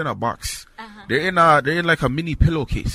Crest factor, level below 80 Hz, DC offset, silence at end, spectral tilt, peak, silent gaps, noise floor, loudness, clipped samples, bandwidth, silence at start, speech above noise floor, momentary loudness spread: 18 dB; -30 dBFS; under 0.1%; 0 s; -5.5 dB/octave; -2 dBFS; none; -39 dBFS; -19 LUFS; under 0.1%; 16 kHz; 0 s; 21 dB; 17 LU